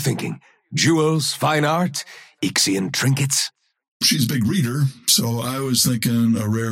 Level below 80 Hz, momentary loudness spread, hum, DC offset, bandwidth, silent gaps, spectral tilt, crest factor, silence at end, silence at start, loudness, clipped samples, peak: -58 dBFS; 10 LU; none; under 0.1%; 17 kHz; 3.88-4.00 s; -4 dB/octave; 16 dB; 0 s; 0 s; -19 LUFS; under 0.1%; -4 dBFS